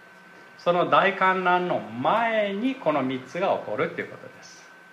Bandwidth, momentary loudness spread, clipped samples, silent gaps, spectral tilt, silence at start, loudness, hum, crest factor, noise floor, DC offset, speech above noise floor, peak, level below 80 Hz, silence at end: 11.5 kHz; 10 LU; under 0.1%; none; -6 dB/octave; 0.35 s; -24 LUFS; none; 18 dB; -49 dBFS; under 0.1%; 25 dB; -6 dBFS; -76 dBFS; 0.2 s